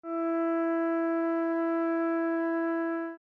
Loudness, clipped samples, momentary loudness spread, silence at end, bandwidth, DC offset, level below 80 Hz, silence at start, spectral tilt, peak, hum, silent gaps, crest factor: -29 LUFS; under 0.1%; 2 LU; 0.05 s; 3.2 kHz; under 0.1%; -86 dBFS; 0.05 s; -6.5 dB/octave; -20 dBFS; none; none; 8 dB